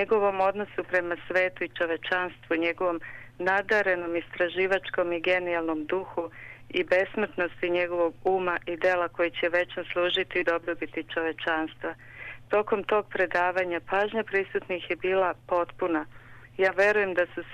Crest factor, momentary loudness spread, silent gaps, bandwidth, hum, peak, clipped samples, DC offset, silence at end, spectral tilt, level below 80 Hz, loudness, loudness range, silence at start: 16 dB; 8 LU; none; 9.6 kHz; none; -12 dBFS; under 0.1%; under 0.1%; 0 s; -5.5 dB/octave; -60 dBFS; -27 LUFS; 2 LU; 0 s